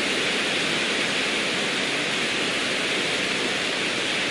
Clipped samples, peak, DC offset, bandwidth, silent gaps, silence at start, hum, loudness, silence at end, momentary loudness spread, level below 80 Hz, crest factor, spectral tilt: under 0.1%; -12 dBFS; under 0.1%; 11.5 kHz; none; 0 s; none; -22 LUFS; 0 s; 1 LU; -62 dBFS; 14 dB; -2 dB/octave